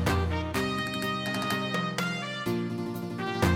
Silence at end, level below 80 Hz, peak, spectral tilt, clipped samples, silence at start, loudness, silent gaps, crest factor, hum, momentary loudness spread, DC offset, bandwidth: 0 s; -44 dBFS; -10 dBFS; -5 dB/octave; under 0.1%; 0 s; -30 LUFS; none; 20 dB; none; 5 LU; under 0.1%; 16.5 kHz